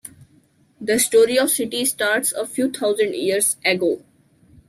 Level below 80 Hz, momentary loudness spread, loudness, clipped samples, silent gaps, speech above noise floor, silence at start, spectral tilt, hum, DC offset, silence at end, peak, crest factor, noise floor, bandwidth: -64 dBFS; 8 LU; -19 LUFS; under 0.1%; none; 38 dB; 0.05 s; -2 dB/octave; none; under 0.1%; 0.7 s; -4 dBFS; 16 dB; -57 dBFS; 16 kHz